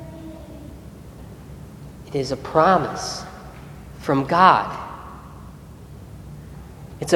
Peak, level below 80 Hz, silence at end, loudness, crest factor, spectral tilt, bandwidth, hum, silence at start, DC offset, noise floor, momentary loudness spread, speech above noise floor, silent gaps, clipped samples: 0 dBFS; -46 dBFS; 0 s; -20 LUFS; 24 dB; -5 dB/octave; 19 kHz; none; 0 s; under 0.1%; -40 dBFS; 25 LU; 22 dB; none; under 0.1%